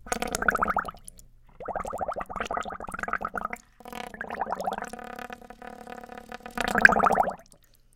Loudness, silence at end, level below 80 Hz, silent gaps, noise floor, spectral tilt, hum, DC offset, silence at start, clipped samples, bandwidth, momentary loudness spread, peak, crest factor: -27 LUFS; 0.55 s; -48 dBFS; none; -57 dBFS; -3.5 dB/octave; none; under 0.1%; 0.05 s; under 0.1%; 17 kHz; 22 LU; 0 dBFS; 30 dB